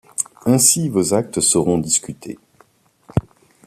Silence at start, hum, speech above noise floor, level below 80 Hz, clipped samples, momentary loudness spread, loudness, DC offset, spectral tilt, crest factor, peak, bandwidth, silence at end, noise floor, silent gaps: 0.2 s; none; 38 dB; -48 dBFS; under 0.1%; 20 LU; -17 LUFS; under 0.1%; -4 dB/octave; 20 dB; 0 dBFS; 14.5 kHz; 0.45 s; -55 dBFS; none